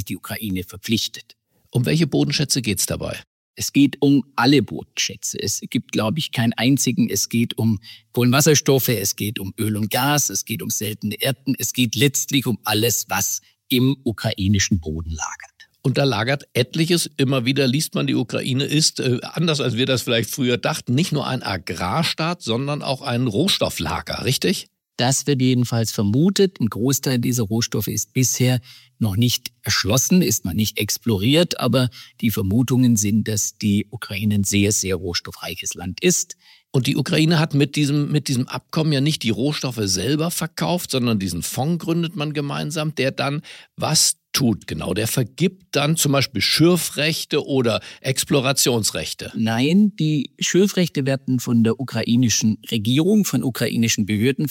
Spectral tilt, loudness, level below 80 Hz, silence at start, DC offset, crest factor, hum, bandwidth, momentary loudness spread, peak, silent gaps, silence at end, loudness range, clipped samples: -4.5 dB/octave; -20 LUFS; -50 dBFS; 0 s; under 0.1%; 18 dB; none; 17 kHz; 8 LU; -2 dBFS; 3.27-3.54 s; 0 s; 3 LU; under 0.1%